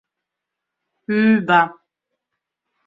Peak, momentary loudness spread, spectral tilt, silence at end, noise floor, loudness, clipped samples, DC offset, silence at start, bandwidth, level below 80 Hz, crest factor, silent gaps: -2 dBFS; 11 LU; -7.5 dB/octave; 1.15 s; -82 dBFS; -17 LUFS; under 0.1%; under 0.1%; 1.1 s; 7.2 kHz; -68 dBFS; 20 dB; none